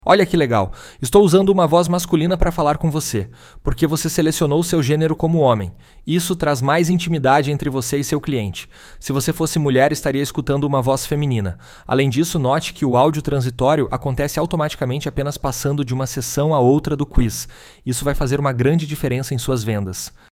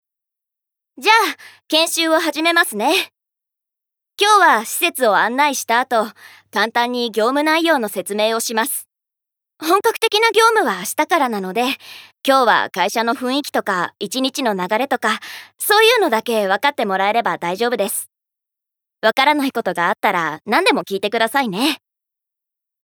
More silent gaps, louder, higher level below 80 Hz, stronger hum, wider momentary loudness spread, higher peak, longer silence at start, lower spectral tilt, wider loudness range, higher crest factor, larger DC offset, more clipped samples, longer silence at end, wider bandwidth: neither; about the same, -18 LUFS vs -17 LUFS; first, -32 dBFS vs -78 dBFS; neither; about the same, 9 LU vs 8 LU; about the same, 0 dBFS vs 0 dBFS; second, 0.05 s vs 1 s; first, -5.5 dB/octave vs -2 dB/octave; about the same, 3 LU vs 3 LU; about the same, 18 dB vs 18 dB; neither; neither; second, 0.2 s vs 1.05 s; second, 17 kHz vs over 20 kHz